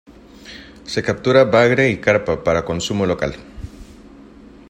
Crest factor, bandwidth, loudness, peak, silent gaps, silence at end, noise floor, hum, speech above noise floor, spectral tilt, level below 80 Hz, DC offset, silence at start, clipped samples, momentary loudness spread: 18 dB; 10.5 kHz; -17 LUFS; 0 dBFS; none; 0.6 s; -42 dBFS; none; 25 dB; -5.5 dB/octave; -44 dBFS; under 0.1%; 0.45 s; under 0.1%; 24 LU